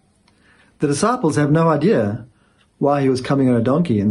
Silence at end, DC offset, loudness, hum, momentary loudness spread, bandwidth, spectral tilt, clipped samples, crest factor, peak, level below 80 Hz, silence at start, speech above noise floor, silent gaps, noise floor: 0 s; under 0.1%; -17 LUFS; none; 7 LU; 11.5 kHz; -7 dB/octave; under 0.1%; 14 dB; -4 dBFS; -54 dBFS; 0.8 s; 40 dB; none; -56 dBFS